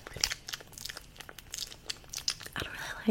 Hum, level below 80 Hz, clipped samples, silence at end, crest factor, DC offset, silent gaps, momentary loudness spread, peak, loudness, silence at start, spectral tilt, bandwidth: none; -54 dBFS; under 0.1%; 0 s; 32 dB; under 0.1%; none; 11 LU; -6 dBFS; -37 LUFS; 0 s; -1.5 dB/octave; 16.5 kHz